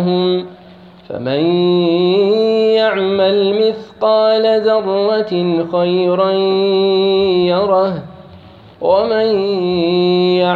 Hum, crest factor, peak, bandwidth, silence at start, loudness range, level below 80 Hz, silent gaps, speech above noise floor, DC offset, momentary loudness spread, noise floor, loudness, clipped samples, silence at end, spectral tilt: none; 12 dB; -2 dBFS; 4.9 kHz; 0 s; 2 LU; -54 dBFS; none; 26 dB; under 0.1%; 5 LU; -39 dBFS; -14 LUFS; under 0.1%; 0 s; -8.5 dB/octave